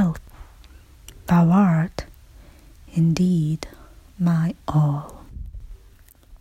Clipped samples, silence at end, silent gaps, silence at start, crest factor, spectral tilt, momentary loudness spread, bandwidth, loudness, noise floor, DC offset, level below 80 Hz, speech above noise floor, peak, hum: under 0.1%; 0.05 s; none; 0 s; 16 dB; -8 dB/octave; 23 LU; 13.5 kHz; -21 LUFS; -50 dBFS; under 0.1%; -44 dBFS; 31 dB; -8 dBFS; none